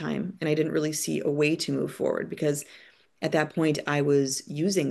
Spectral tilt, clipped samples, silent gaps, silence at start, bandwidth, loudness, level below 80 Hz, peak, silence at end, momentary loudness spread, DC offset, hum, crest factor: -5 dB/octave; under 0.1%; none; 0 s; 12.5 kHz; -27 LUFS; -68 dBFS; -10 dBFS; 0 s; 6 LU; under 0.1%; none; 18 dB